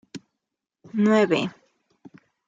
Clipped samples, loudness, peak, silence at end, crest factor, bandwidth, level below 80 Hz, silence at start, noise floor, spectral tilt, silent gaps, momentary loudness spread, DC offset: under 0.1%; -22 LUFS; -8 dBFS; 1 s; 18 dB; 7.6 kHz; -72 dBFS; 0.15 s; -84 dBFS; -6.5 dB/octave; none; 24 LU; under 0.1%